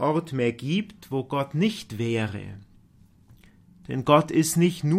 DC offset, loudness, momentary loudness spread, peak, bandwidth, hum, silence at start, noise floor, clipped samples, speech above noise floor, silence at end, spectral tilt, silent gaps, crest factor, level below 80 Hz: under 0.1%; -25 LUFS; 12 LU; -4 dBFS; 15.5 kHz; none; 0 s; -56 dBFS; under 0.1%; 32 dB; 0 s; -5.5 dB/octave; none; 22 dB; -58 dBFS